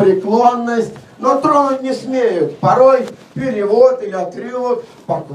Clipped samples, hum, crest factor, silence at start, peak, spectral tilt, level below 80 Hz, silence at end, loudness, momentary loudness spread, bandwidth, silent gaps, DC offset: under 0.1%; none; 14 dB; 0 s; 0 dBFS; -6.5 dB/octave; -58 dBFS; 0 s; -15 LUFS; 12 LU; 10.5 kHz; none; under 0.1%